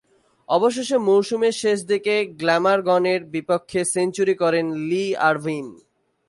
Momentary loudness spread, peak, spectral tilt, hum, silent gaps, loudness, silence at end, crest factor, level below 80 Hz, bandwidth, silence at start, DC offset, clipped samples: 6 LU; -6 dBFS; -4.5 dB/octave; none; none; -21 LUFS; 0.55 s; 16 dB; -68 dBFS; 11.5 kHz; 0.5 s; under 0.1%; under 0.1%